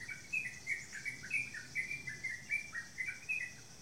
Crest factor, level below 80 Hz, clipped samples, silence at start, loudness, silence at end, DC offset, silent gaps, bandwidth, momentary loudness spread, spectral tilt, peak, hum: 18 dB; -70 dBFS; under 0.1%; 0 s; -40 LUFS; 0 s; 0.1%; none; 16 kHz; 5 LU; -1.5 dB/octave; -26 dBFS; none